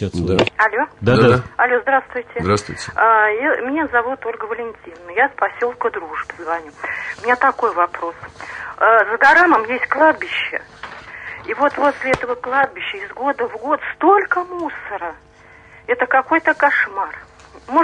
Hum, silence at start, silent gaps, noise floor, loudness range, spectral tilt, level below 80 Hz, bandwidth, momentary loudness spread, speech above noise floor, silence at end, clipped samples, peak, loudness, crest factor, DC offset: none; 0 s; none; -45 dBFS; 5 LU; -5.5 dB/octave; -50 dBFS; 10.5 kHz; 15 LU; 27 dB; 0 s; under 0.1%; -2 dBFS; -17 LUFS; 16 dB; under 0.1%